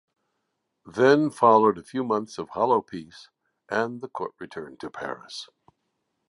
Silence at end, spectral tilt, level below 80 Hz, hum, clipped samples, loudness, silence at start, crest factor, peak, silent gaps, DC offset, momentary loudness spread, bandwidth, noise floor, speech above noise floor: 0.85 s; -6 dB/octave; -68 dBFS; none; under 0.1%; -24 LUFS; 0.85 s; 22 dB; -4 dBFS; none; under 0.1%; 20 LU; 11.5 kHz; -78 dBFS; 54 dB